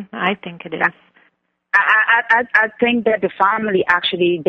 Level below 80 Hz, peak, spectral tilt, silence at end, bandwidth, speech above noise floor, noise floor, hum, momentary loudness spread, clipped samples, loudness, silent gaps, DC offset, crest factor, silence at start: -60 dBFS; 0 dBFS; -6 dB/octave; 0.05 s; 7 kHz; 45 dB; -63 dBFS; none; 8 LU; under 0.1%; -16 LUFS; none; under 0.1%; 16 dB; 0 s